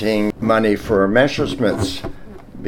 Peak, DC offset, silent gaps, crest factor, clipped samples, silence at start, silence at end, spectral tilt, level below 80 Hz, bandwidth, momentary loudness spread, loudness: 0 dBFS; under 0.1%; none; 18 dB; under 0.1%; 0 s; 0 s; -6 dB/octave; -38 dBFS; 17.5 kHz; 9 LU; -17 LUFS